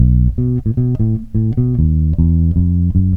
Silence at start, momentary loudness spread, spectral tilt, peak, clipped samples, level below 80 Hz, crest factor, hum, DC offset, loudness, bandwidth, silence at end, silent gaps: 0 s; 4 LU; -13.5 dB/octave; 0 dBFS; under 0.1%; -20 dBFS; 14 dB; none; 2%; -15 LUFS; 1.3 kHz; 0 s; none